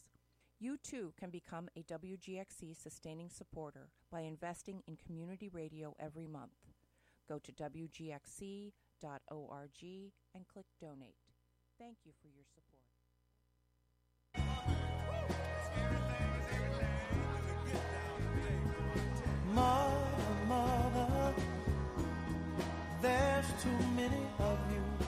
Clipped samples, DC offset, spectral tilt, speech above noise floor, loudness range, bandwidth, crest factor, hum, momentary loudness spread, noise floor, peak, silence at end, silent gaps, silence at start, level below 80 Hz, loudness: under 0.1%; under 0.1%; -6 dB/octave; 32 dB; 17 LU; 15.5 kHz; 20 dB; 60 Hz at -65 dBFS; 19 LU; -77 dBFS; -20 dBFS; 0 s; none; 0.6 s; -48 dBFS; -39 LUFS